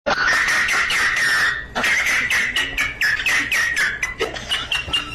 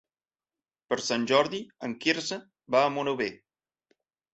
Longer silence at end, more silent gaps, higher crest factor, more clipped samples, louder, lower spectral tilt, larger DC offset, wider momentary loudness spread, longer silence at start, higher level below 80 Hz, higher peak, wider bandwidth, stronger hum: second, 0 s vs 1 s; neither; second, 12 dB vs 22 dB; neither; first, -18 LUFS vs -28 LUFS; second, -1 dB/octave vs -3.5 dB/octave; neither; second, 5 LU vs 11 LU; second, 0.05 s vs 0.9 s; first, -42 dBFS vs -74 dBFS; about the same, -8 dBFS vs -8 dBFS; first, 15 kHz vs 8.2 kHz; neither